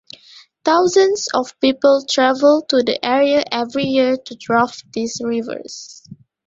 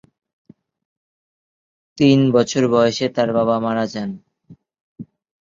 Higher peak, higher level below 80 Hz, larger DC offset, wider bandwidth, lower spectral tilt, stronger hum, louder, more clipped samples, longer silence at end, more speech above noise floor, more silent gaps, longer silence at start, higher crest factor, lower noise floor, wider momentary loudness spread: about the same, -2 dBFS vs -2 dBFS; about the same, -60 dBFS vs -60 dBFS; neither; about the same, 7.8 kHz vs 7.6 kHz; second, -3.5 dB/octave vs -6 dB/octave; neither; about the same, -17 LUFS vs -17 LUFS; neither; second, 0.3 s vs 0.55 s; about the same, 30 dB vs 32 dB; second, none vs 4.81-4.96 s; second, 0.65 s vs 1.95 s; about the same, 16 dB vs 18 dB; about the same, -46 dBFS vs -49 dBFS; about the same, 11 LU vs 12 LU